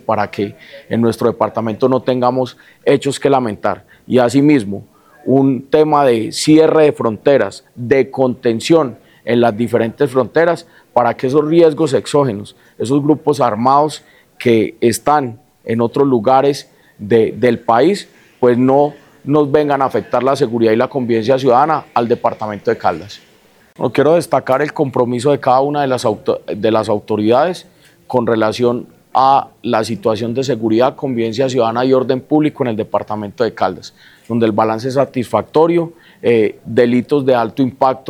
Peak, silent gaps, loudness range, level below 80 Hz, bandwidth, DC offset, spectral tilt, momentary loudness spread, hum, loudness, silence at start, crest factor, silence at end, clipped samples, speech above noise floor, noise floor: 0 dBFS; none; 3 LU; -56 dBFS; 14.5 kHz; under 0.1%; -6.5 dB/octave; 9 LU; none; -15 LUFS; 0.1 s; 14 dB; 0 s; under 0.1%; 35 dB; -49 dBFS